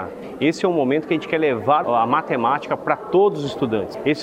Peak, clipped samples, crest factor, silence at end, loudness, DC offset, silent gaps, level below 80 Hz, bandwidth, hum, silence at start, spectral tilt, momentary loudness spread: -2 dBFS; under 0.1%; 18 dB; 0 s; -20 LUFS; under 0.1%; none; -60 dBFS; 10.5 kHz; none; 0 s; -6.5 dB/octave; 5 LU